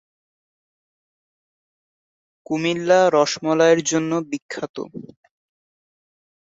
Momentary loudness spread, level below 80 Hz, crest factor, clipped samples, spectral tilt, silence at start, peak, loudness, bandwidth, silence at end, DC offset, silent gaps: 16 LU; -70 dBFS; 20 dB; under 0.1%; -4 dB/octave; 2.5 s; -2 dBFS; -19 LUFS; 8 kHz; 1.45 s; under 0.1%; 4.42-4.49 s, 4.69-4.74 s